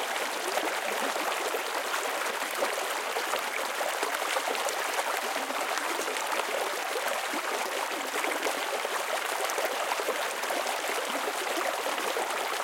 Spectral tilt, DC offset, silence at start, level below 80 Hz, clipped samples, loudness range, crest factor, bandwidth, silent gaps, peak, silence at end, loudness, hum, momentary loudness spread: 0.5 dB/octave; under 0.1%; 0 s; -82 dBFS; under 0.1%; 0 LU; 20 dB; 17 kHz; none; -10 dBFS; 0 s; -30 LUFS; none; 1 LU